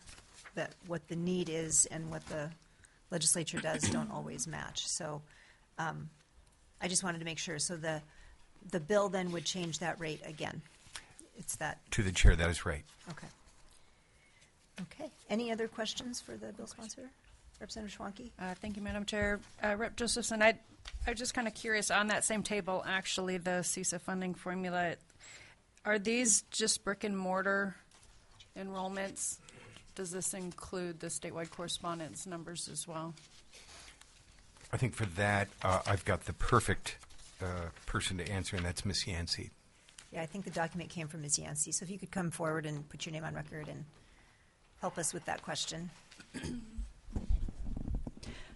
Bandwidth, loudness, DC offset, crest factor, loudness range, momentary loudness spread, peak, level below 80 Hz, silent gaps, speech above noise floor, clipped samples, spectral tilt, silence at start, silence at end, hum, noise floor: 11.5 kHz; -36 LUFS; under 0.1%; 26 dB; 8 LU; 19 LU; -12 dBFS; -46 dBFS; none; 29 dB; under 0.1%; -3.5 dB/octave; 0.05 s; 0 s; none; -65 dBFS